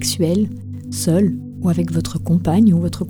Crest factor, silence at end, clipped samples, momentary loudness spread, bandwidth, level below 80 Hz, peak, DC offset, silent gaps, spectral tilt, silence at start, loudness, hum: 14 dB; 0 s; under 0.1%; 9 LU; 19 kHz; -42 dBFS; -4 dBFS; under 0.1%; none; -6.5 dB/octave; 0 s; -18 LUFS; none